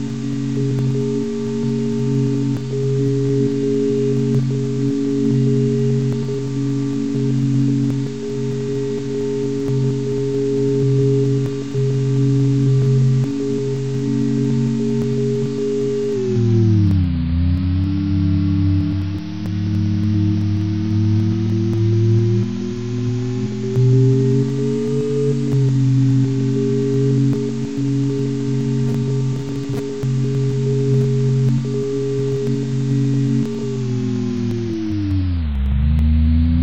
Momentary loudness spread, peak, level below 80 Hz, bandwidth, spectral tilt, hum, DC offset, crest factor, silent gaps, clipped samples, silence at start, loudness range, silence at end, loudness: 6 LU; -4 dBFS; -32 dBFS; 8.2 kHz; -8.5 dB/octave; none; 2%; 12 dB; none; under 0.1%; 0 s; 3 LU; 0 s; -19 LUFS